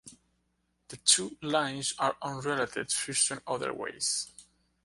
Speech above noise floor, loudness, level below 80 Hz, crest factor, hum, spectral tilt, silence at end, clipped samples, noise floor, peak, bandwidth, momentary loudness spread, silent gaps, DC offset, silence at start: 45 dB; -29 LUFS; -70 dBFS; 24 dB; none; -1.5 dB/octave; 0.45 s; under 0.1%; -76 dBFS; -8 dBFS; 12 kHz; 10 LU; none; under 0.1%; 0.05 s